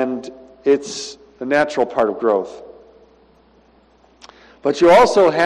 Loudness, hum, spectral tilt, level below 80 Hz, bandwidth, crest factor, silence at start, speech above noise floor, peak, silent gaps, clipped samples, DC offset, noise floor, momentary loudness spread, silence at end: -16 LUFS; none; -4.5 dB/octave; -52 dBFS; 11.5 kHz; 14 dB; 0 s; 37 dB; -4 dBFS; none; under 0.1%; under 0.1%; -53 dBFS; 21 LU; 0 s